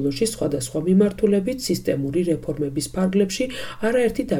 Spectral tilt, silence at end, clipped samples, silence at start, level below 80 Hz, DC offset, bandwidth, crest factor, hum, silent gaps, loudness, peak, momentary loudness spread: -5.5 dB/octave; 0 s; under 0.1%; 0 s; -46 dBFS; under 0.1%; 18 kHz; 14 dB; none; none; -22 LUFS; -6 dBFS; 7 LU